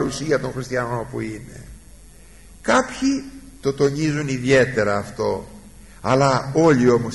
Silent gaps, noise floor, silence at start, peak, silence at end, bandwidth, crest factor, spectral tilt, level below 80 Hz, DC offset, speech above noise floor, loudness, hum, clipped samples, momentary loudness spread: none; -45 dBFS; 0 s; -6 dBFS; 0 s; 11.5 kHz; 16 dB; -5.5 dB/octave; -46 dBFS; 0.3%; 26 dB; -20 LUFS; none; under 0.1%; 14 LU